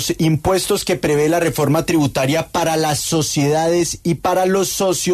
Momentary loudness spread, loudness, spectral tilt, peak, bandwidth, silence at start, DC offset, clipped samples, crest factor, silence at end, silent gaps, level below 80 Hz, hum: 2 LU; -17 LUFS; -4.5 dB/octave; -4 dBFS; 14 kHz; 0 s; under 0.1%; under 0.1%; 14 dB; 0 s; none; -42 dBFS; none